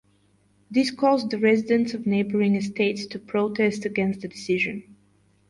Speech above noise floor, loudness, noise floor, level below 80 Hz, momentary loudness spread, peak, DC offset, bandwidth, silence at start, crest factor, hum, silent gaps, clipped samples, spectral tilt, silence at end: 39 dB; -24 LUFS; -63 dBFS; -64 dBFS; 6 LU; -8 dBFS; under 0.1%; 11.5 kHz; 0.7 s; 16 dB; none; none; under 0.1%; -6 dB/octave; 0.55 s